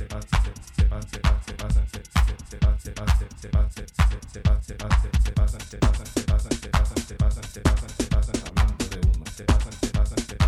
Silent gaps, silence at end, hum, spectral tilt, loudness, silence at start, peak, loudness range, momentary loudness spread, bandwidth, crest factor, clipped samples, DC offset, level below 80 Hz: none; 0 s; none; -5.5 dB/octave; -26 LUFS; 0 s; -6 dBFS; 1 LU; 3 LU; 13 kHz; 16 dB; under 0.1%; under 0.1%; -24 dBFS